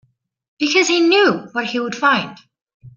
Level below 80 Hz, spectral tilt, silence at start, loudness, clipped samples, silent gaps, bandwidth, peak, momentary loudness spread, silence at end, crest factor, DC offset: -64 dBFS; -3 dB/octave; 0.6 s; -16 LUFS; under 0.1%; 2.62-2.66 s, 2.74-2.80 s; 7.4 kHz; -2 dBFS; 9 LU; 0.05 s; 16 dB; under 0.1%